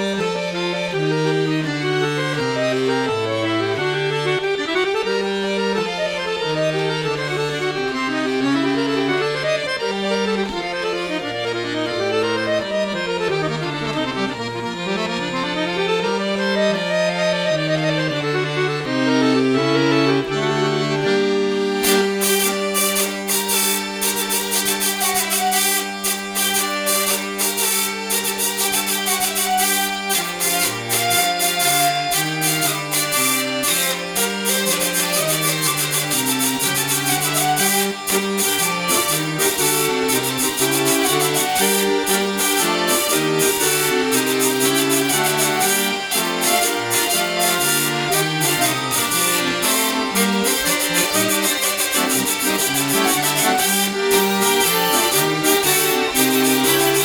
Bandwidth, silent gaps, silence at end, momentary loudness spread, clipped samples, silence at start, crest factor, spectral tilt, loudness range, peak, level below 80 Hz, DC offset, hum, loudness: over 20 kHz; none; 0 s; 6 LU; under 0.1%; 0 s; 18 dB; -2.5 dB/octave; 5 LU; 0 dBFS; -54 dBFS; under 0.1%; none; -18 LUFS